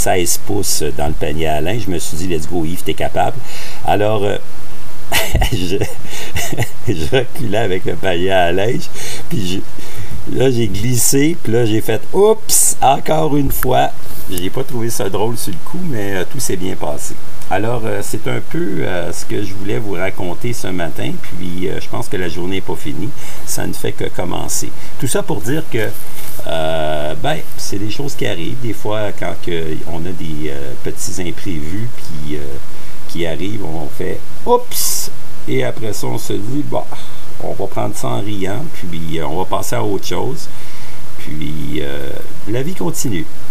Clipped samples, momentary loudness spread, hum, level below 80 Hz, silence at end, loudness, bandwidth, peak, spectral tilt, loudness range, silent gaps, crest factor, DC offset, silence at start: under 0.1%; 12 LU; none; -34 dBFS; 0 s; -19 LUFS; 16 kHz; 0 dBFS; -4.5 dB/octave; 9 LU; none; 20 dB; 40%; 0 s